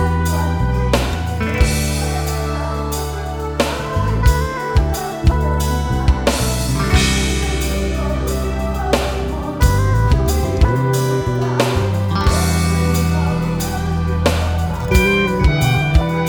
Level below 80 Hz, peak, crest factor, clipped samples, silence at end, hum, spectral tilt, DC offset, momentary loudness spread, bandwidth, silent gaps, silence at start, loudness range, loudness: -20 dBFS; 0 dBFS; 16 dB; under 0.1%; 0 s; none; -5.5 dB/octave; under 0.1%; 6 LU; over 20 kHz; none; 0 s; 3 LU; -17 LUFS